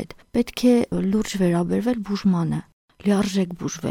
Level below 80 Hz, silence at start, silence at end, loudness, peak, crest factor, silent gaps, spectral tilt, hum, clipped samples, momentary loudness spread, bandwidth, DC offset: -48 dBFS; 0 s; 0 s; -22 LUFS; -8 dBFS; 14 dB; 2.73-2.88 s; -6.5 dB/octave; none; under 0.1%; 8 LU; 16 kHz; under 0.1%